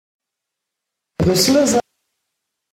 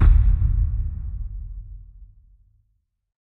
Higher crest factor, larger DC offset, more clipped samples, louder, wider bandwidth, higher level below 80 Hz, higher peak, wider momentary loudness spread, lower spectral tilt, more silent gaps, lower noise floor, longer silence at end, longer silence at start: about the same, 18 dB vs 18 dB; neither; neither; first, -16 LUFS vs -24 LUFS; first, 16.5 kHz vs 2.6 kHz; second, -44 dBFS vs -22 dBFS; about the same, -2 dBFS vs -4 dBFS; second, 9 LU vs 23 LU; second, -4 dB/octave vs -10.5 dB/octave; neither; first, -81 dBFS vs -70 dBFS; second, 0.95 s vs 1.3 s; first, 1.2 s vs 0 s